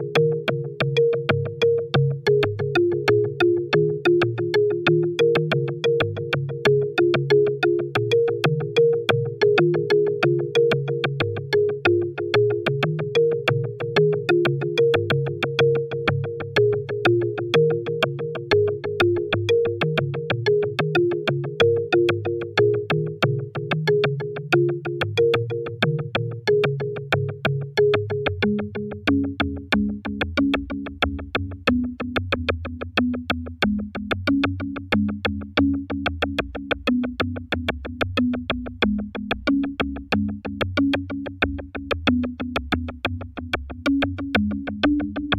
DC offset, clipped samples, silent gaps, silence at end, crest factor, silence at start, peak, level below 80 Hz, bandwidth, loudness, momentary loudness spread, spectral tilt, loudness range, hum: under 0.1%; under 0.1%; none; 0 s; 18 dB; 0 s; -4 dBFS; -44 dBFS; 14 kHz; -22 LUFS; 7 LU; -7 dB/octave; 5 LU; none